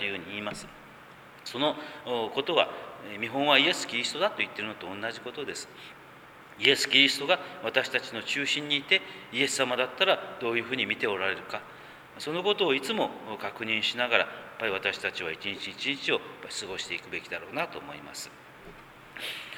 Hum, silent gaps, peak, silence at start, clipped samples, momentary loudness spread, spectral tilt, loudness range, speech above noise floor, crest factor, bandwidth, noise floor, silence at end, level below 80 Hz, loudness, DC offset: none; none; -4 dBFS; 0 s; under 0.1%; 17 LU; -2.5 dB/octave; 7 LU; 21 dB; 26 dB; over 20 kHz; -50 dBFS; 0 s; -70 dBFS; -28 LUFS; under 0.1%